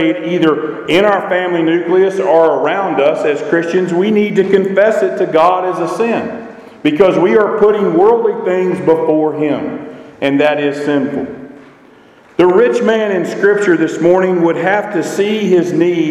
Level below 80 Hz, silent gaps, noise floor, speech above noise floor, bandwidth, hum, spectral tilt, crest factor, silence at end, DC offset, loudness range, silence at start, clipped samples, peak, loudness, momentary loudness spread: -56 dBFS; none; -43 dBFS; 31 dB; 11.5 kHz; none; -6.5 dB/octave; 12 dB; 0 s; under 0.1%; 3 LU; 0 s; under 0.1%; 0 dBFS; -12 LUFS; 8 LU